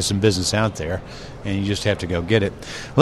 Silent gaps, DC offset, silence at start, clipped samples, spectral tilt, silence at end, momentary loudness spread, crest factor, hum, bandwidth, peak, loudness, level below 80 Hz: none; under 0.1%; 0 s; under 0.1%; -5 dB/octave; 0 s; 12 LU; 22 dB; none; 13.5 kHz; 0 dBFS; -22 LUFS; -42 dBFS